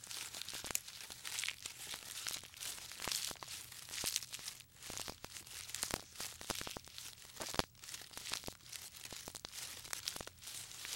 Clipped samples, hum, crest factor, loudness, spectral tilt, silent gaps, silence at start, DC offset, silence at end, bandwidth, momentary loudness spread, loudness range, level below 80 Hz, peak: under 0.1%; none; 34 dB; -44 LUFS; -0.5 dB/octave; none; 0 s; under 0.1%; 0 s; 17 kHz; 9 LU; 3 LU; -66 dBFS; -12 dBFS